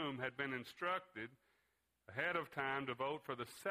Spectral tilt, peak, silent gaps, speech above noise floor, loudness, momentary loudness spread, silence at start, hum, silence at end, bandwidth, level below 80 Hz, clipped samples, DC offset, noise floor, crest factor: -5 dB/octave; -24 dBFS; none; 39 dB; -43 LUFS; 10 LU; 0 s; none; 0 s; 15.5 kHz; -80 dBFS; under 0.1%; under 0.1%; -83 dBFS; 20 dB